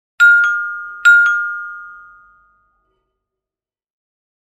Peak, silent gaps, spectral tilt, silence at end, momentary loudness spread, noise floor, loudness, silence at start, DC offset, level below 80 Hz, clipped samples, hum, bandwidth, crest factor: 0 dBFS; none; 3.5 dB/octave; 2.55 s; 19 LU; under -90 dBFS; -12 LUFS; 0.2 s; under 0.1%; -68 dBFS; under 0.1%; none; 13.5 kHz; 16 dB